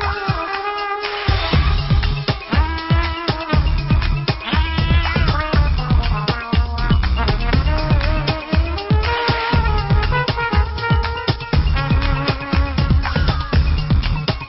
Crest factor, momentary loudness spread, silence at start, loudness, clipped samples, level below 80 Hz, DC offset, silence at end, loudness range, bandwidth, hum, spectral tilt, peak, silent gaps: 12 dB; 4 LU; 0 s; -18 LUFS; under 0.1%; -20 dBFS; under 0.1%; 0 s; 1 LU; 5.8 kHz; none; -9.5 dB/octave; -4 dBFS; none